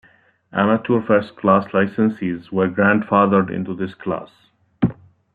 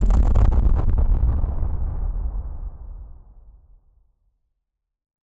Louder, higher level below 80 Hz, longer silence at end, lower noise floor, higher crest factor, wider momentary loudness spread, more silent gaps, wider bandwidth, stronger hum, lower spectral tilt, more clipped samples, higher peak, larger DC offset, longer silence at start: first, -19 LUFS vs -23 LUFS; second, -54 dBFS vs -22 dBFS; second, 0.4 s vs 2.15 s; second, -54 dBFS vs -80 dBFS; about the same, 18 dB vs 16 dB; second, 11 LU vs 19 LU; neither; first, 4.8 kHz vs 3.3 kHz; neither; about the same, -10 dB/octave vs -9.5 dB/octave; neither; about the same, -2 dBFS vs -4 dBFS; neither; first, 0.55 s vs 0 s